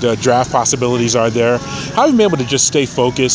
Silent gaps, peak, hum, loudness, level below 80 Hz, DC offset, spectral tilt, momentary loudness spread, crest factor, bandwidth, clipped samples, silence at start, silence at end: none; 0 dBFS; none; -14 LUFS; -42 dBFS; under 0.1%; -4 dB/octave; 4 LU; 14 dB; 8 kHz; under 0.1%; 0 s; 0 s